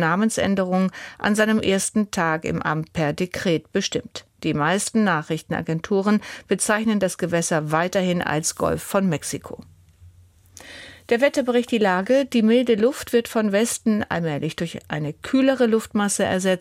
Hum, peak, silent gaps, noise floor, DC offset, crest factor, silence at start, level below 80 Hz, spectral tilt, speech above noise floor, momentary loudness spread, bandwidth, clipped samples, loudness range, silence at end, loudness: none; -6 dBFS; none; -51 dBFS; under 0.1%; 16 dB; 0 s; -54 dBFS; -4.5 dB/octave; 30 dB; 9 LU; 16.5 kHz; under 0.1%; 4 LU; 0 s; -22 LUFS